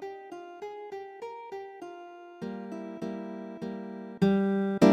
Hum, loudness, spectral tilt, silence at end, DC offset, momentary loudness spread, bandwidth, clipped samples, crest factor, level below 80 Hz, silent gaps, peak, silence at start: none; -33 LUFS; -7.5 dB/octave; 0 s; under 0.1%; 18 LU; 9.4 kHz; under 0.1%; 24 dB; -66 dBFS; none; -6 dBFS; 0 s